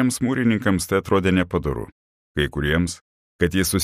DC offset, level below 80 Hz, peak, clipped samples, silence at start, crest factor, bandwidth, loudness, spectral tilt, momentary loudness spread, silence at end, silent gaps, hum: under 0.1%; -38 dBFS; -4 dBFS; under 0.1%; 0 s; 16 dB; 15.5 kHz; -22 LUFS; -5 dB/octave; 11 LU; 0 s; 1.92-2.35 s, 3.01-3.39 s; none